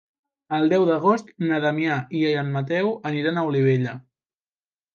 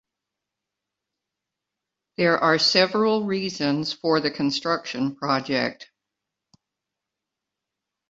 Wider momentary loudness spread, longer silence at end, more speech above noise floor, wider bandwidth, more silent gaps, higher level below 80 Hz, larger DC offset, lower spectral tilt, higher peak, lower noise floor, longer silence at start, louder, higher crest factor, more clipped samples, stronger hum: second, 6 LU vs 9 LU; second, 0.95 s vs 2.25 s; first, over 68 dB vs 63 dB; second, 7.2 kHz vs 8 kHz; neither; about the same, -70 dBFS vs -68 dBFS; neither; first, -7.5 dB/octave vs -4.5 dB/octave; about the same, -6 dBFS vs -4 dBFS; first, under -90 dBFS vs -85 dBFS; second, 0.5 s vs 2.2 s; about the same, -22 LUFS vs -22 LUFS; second, 16 dB vs 22 dB; neither; neither